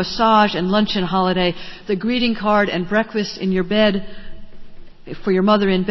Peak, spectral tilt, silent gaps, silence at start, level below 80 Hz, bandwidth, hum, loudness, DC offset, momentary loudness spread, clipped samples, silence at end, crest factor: -2 dBFS; -6.5 dB/octave; none; 0 s; -44 dBFS; 6.2 kHz; none; -18 LUFS; under 0.1%; 10 LU; under 0.1%; 0 s; 16 dB